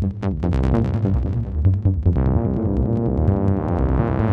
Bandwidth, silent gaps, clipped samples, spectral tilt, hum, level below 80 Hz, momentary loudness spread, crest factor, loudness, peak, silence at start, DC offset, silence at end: 4.8 kHz; none; under 0.1%; -11 dB/octave; none; -26 dBFS; 3 LU; 14 dB; -20 LUFS; -6 dBFS; 0 s; under 0.1%; 0 s